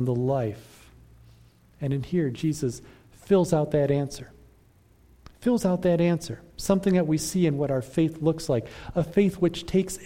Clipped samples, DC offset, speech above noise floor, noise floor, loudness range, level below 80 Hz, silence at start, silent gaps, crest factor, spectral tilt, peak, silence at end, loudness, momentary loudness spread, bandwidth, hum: under 0.1%; under 0.1%; 33 dB; -58 dBFS; 3 LU; -50 dBFS; 0 s; none; 18 dB; -6.5 dB/octave; -8 dBFS; 0 s; -25 LUFS; 10 LU; 16.5 kHz; none